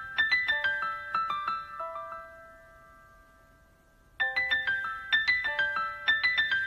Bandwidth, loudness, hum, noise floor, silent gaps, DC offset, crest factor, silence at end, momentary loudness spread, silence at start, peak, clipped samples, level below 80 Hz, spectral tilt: 14 kHz; -28 LUFS; none; -61 dBFS; none; under 0.1%; 18 dB; 0 s; 13 LU; 0 s; -14 dBFS; under 0.1%; -62 dBFS; -2 dB/octave